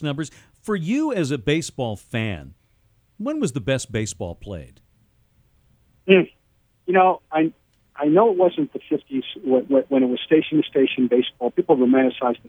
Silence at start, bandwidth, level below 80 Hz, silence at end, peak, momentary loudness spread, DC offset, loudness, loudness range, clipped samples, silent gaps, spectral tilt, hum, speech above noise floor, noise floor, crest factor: 0 s; 13 kHz; -52 dBFS; 0.15 s; 0 dBFS; 14 LU; under 0.1%; -21 LUFS; 9 LU; under 0.1%; none; -6 dB/octave; none; 43 dB; -63 dBFS; 20 dB